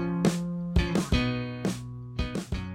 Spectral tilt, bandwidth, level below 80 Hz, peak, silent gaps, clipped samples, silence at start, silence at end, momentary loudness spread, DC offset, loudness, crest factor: -6 dB/octave; 15.5 kHz; -36 dBFS; -8 dBFS; none; under 0.1%; 0 s; 0 s; 8 LU; under 0.1%; -30 LUFS; 20 dB